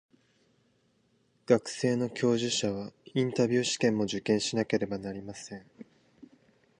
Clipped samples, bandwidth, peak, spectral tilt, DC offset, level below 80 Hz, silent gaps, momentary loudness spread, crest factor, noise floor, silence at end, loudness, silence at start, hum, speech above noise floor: under 0.1%; 11 kHz; -10 dBFS; -4.5 dB/octave; under 0.1%; -68 dBFS; none; 13 LU; 22 dB; -70 dBFS; 0.95 s; -29 LUFS; 1.5 s; none; 41 dB